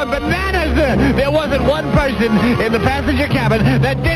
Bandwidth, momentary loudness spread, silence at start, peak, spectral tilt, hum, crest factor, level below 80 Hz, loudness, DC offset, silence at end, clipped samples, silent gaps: 14 kHz; 2 LU; 0 s; -2 dBFS; -7 dB/octave; none; 12 dB; -24 dBFS; -15 LUFS; under 0.1%; 0 s; under 0.1%; none